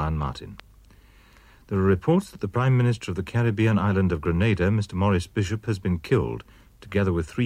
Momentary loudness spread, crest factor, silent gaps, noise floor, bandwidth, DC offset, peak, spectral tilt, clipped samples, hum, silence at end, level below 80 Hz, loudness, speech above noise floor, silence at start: 8 LU; 16 dB; none; -53 dBFS; 12 kHz; under 0.1%; -8 dBFS; -7.5 dB/octave; under 0.1%; none; 0 s; -42 dBFS; -24 LUFS; 29 dB; 0 s